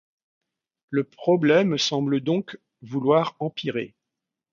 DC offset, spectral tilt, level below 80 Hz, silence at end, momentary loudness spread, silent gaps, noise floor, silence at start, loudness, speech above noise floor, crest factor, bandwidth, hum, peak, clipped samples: under 0.1%; -5.5 dB/octave; -70 dBFS; 0.65 s; 13 LU; none; -85 dBFS; 0.9 s; -23 LUFS; 63 dB; 18 dB; 7.4 kHz; none; -6 dBFS; under 0.1%